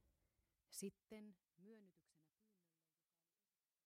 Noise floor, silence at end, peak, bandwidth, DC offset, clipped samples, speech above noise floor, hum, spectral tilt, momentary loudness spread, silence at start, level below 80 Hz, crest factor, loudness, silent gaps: under -90 dBFS; 1.65 s; -40 dBFS; 15.5 kHz; under 0.1%; under 0.1%; over 30 dB; none; -4 dB/octave; 14 LU; 0.05 s; under -90 dBFS; 24 dB; -58 LUFS; none